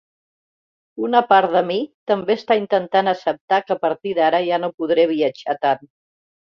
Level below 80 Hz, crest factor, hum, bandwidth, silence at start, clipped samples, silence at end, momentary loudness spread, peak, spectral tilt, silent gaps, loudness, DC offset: -68 dBFS; 18 dB; none; 6.8 kHz; 0.95 s; under 0.1%; 0.8 s; 8 LU; -2 dBFS; -6.5 dB/octave; 1.94-2.07 s, 3.41-3.48 s, 4.74-4.78 s; -19 LUFS; under 0.1%